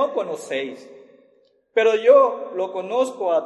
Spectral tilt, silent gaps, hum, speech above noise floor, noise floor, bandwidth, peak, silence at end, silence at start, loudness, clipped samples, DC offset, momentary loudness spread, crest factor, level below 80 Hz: -3.5 dB/octave; none; none; 40 dB; -60 dBFS; 12 kHz; -4 dBFS; 0 s; 0 s; -20 LUFS; under 0.1%; under 0.1%; 14 LU; 18 dB; -82 dBFS